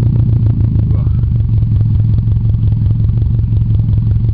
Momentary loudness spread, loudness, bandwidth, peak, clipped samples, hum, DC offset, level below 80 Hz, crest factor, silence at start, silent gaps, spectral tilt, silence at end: 1 LU; -13 LUFS; 1.6 kHz; -2 dBFS; under 0.1%; none; 3%; -18 dBFS; 8 dB; 0 s; none; -13 dB/octave; 0 s